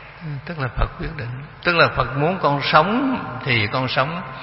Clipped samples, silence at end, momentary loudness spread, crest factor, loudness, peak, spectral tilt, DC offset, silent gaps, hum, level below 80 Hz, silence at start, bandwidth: under 0.1%; 0 s; 14 LU; 20 dB; -20 LUFS; 0 dBFS; -9 dB/octave; under 0.1%; none; none; -34 dBFS; 0 s; 5.8 kHz